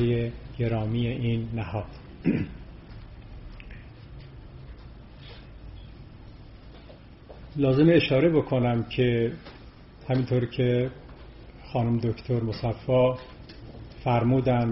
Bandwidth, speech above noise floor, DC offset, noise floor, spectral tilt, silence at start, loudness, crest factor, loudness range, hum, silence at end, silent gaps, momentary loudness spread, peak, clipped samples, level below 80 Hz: 5.8 kHz; 23 dB; under 0.1%; -47 dBFS; -7 dB/octave; 0 s; -26 LUFS; 18 dB; 21 LU; none; 0 s; none; 24 LU; -8 dBFS; under 0.1%; -46 dBFS